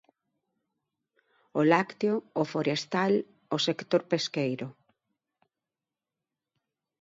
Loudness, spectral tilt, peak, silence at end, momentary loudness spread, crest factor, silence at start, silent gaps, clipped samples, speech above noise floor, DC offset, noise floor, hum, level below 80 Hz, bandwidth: -28 LUFS; -5.5 dB/octave; -8 dBFS; 2.3 s; 9 LU; 22 dB; 1.55 s; none; under 0.1%; over 62 dB; under 0.1%; under -90 dBFS; none; -80 dBFS; 7.8 kHz